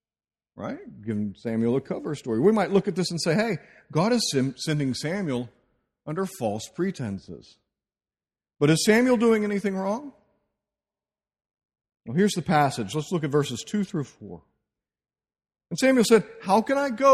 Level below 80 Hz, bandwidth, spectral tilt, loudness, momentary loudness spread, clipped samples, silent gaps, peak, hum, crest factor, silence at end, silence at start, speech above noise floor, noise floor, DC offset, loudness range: -62 dBFS; 14 kHz; -5.5 dB/octave; -25 LUFS; 16 LU; under 0.1%; none; -6 dBFS; none; 20 dB; 0 s; 0.55 s; over 66 dB; under -90 dBFS; under 0.1%; 6 LU